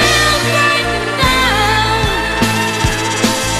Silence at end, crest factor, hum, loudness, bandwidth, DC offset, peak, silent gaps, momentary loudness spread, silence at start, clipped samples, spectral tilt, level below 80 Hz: 0 s; 14 dB; none; -13 LUFS; 15.5 kHz; under 0.1%; 0 dBFS; none; 4 LU; 0 s; under 0.1%; -3 dB/octave; -26 dBFS